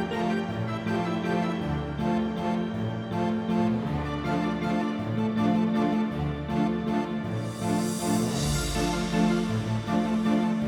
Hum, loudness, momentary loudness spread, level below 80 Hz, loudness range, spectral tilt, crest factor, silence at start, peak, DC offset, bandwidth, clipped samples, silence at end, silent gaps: none; -27 LUFS; 5 LU; -44 dBFS; 1 LU; -6 dB/octave; 14 dB; 0 s; -12 dBFS; under 0.1%; 17.5 kHz; under 0.1%; 0 s; none